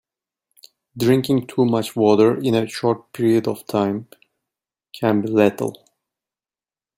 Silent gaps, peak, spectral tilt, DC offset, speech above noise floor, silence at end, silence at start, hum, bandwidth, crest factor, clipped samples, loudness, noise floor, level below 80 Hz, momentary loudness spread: none; -2 dBFS; -6.5 dB/octave; under 0.1%; over 72 dB; 1.25 s; 0.95 s; none; 16.5 kHz; 18 dB; under 0.1%; -19 LUFS; under -90 dBFS; -62 dBFS; 8 LU